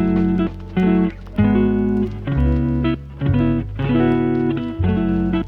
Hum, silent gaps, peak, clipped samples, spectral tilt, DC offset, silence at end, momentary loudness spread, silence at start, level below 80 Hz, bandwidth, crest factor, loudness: none; none; -4 dBFS; under 0.1%; -10.5 dB/octave; under 0.1%; 0 s; 5 LU; 0 s; -28 dBFS; 5 kHz; 14 dB; -19 LUFS